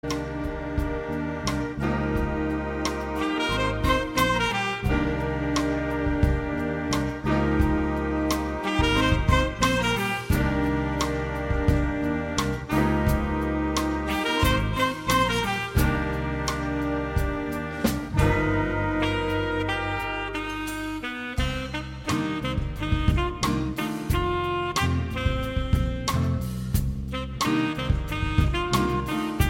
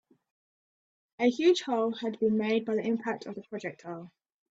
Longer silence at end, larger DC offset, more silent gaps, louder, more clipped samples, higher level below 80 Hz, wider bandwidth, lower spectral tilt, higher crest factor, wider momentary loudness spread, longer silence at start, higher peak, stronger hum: second, 0 s vs 0.45 s; neither; neither; first, -26 LUFS vs -29 LUFS; neither; first, -32 dBFS vs -76 dBFS; first, 17 kHz vs 8 kHz; about the same, -5.5 dB/octave vs -5.5 dB/octave; about the same, 18 dB vs 18 dB; second, 7 LU vs 15 LU; second, 0.05 s vs 1.2 s; first, -6 dBFS vs -14 dBFS; neither